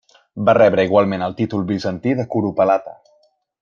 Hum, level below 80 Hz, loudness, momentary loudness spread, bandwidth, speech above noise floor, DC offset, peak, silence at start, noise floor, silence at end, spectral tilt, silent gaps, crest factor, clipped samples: none; -58 dBFS; -17 LUFS; 9 LU; 7.2 kHz; 43 dB; under 0.1%; -2 dBFS; 0.35 s; -59 dBFS; 0.7 s; -8 dB/octave; none; 16 dB; under 0.1%